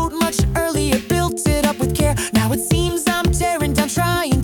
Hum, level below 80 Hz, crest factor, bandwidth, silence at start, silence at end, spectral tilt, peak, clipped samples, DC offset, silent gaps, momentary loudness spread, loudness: none; -28 dBFS; 12 dB; 18 kHz; 0 s; 0 s; -4.5 dB/octave; -6 dBFS; under 0.1%; under 0.1%; none; 1 LU; -18 LUFS